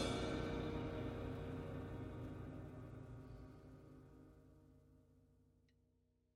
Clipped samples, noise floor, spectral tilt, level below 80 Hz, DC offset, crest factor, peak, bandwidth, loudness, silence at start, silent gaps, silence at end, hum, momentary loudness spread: under 0.1%; -79 dBFS; -6 dB/octave; -60 dBFS; under 0.1%; 20 dB; -30 dBFS; 15 kHz; -48 LUFS; 0 s; none; 1 s; none; 21 LU